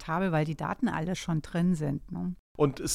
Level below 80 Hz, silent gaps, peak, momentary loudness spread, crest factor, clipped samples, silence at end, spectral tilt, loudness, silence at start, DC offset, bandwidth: -50 dBFS; 2.39-2.55 s; -12 dBFS; 7 LU; 18 dB; under 0.1%; 0 s; -6 dB/octave; -30 LUFS; 0 s; under 0.1%; 14.5 kHz